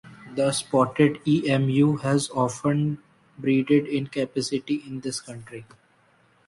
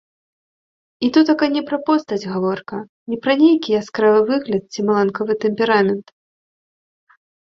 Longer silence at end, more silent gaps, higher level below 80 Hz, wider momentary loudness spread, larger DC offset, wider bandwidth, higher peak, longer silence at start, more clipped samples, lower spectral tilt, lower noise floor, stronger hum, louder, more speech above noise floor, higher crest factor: second, 0.85 s vs 1.4 s; second, none vs 2.89-3.06 s; about the same, -62 dBFS vs -62 dBFS; first, 14 LU vs 9 LU; neither; first, 11.5 kHz vs 7.2 kHz; second, -6 dBFS vs -2 dBFS; second, 0.05 s vs 1 s; neither; about the same, -6 dB/octave vs -6 dB/octave; second, -61 dBFS vs under -90 dBFS; neither; second, -24 LUFS vs -18 LUFS; second, 38 dB vs over 73 dB; about the same, 18 dB vs 16 dB